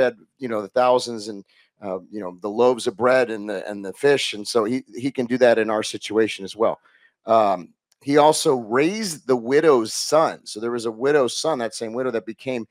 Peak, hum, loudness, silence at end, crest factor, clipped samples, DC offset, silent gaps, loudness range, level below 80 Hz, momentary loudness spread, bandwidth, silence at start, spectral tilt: -2 dBFS; none; -21 LUFS; 0.05 s; 18 dB; under 0.1%; under 0.1%; none; 3 LU; -74 dBFS; 14 LU; 16 kHz; 0 s; -4 dB/octave